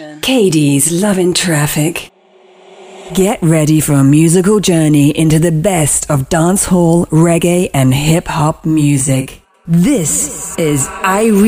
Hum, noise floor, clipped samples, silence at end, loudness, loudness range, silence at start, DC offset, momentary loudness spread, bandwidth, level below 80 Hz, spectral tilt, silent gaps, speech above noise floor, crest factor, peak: none; -44 dBFS; under 0.1%; 0 s; -11 LUFS; 3 LU; 0 s; under 0.1%; 5 LU; 16 kHz; -36 dBFS; -5 dB/octave; none; 34 dB; 12 dB; 0 dBFS